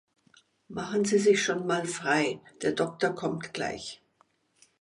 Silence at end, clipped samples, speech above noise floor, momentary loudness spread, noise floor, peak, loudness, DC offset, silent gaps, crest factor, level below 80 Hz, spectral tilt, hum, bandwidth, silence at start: 0.85 s; under 0.1%; 40 dB; 15 LU; -68 dBFS; -12 dBFS; -28 LUFS; under 0.1%; none; 18 dB; -68 dBFS; -4 dB/octave; none; 11.5 kHz; 0.7 s